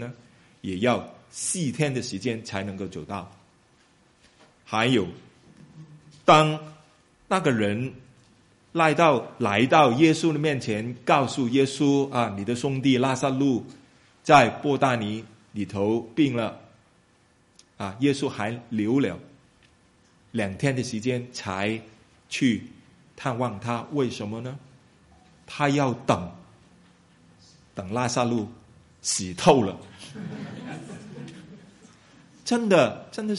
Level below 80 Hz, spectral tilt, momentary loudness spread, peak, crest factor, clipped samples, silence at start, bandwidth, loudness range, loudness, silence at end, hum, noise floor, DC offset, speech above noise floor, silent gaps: -62 dBFS; -5 dB/octave; 18 LU; -2 dBFS; 24 dB; under 0.1%; 0 s; 11.5 kHz; 8 LU; -24 LUFS; 0 s; none; -61 dBFS; under 0.1%; 38 dB; none